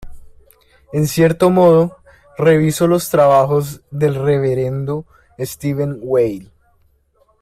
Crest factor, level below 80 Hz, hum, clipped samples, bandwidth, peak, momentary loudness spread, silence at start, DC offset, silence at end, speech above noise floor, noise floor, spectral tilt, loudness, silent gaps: 14 dB; -46 dBFS; none; under 0.1%; 16 kHz; -2 dBFS; 14 LU; 0 s; under 0.1%; 0.95 s; 43 dB; -58 dBFS; -6.5 dB/octave; -15 LUFS; none